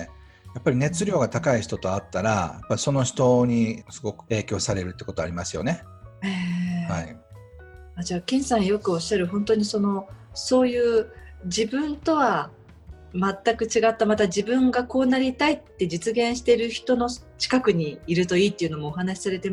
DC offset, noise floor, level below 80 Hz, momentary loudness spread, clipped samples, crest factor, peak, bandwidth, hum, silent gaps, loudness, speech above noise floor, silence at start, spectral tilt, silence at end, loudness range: under 0.1%; -46 dBFS; -50 dBFS; 10 LU; under 0.1%; 18 dB; -6 dBFS; 11.5 kHz; none; none; -24 LUFS; 22 dB; 0 s; -5 dB/octave; 0 s; 6 LU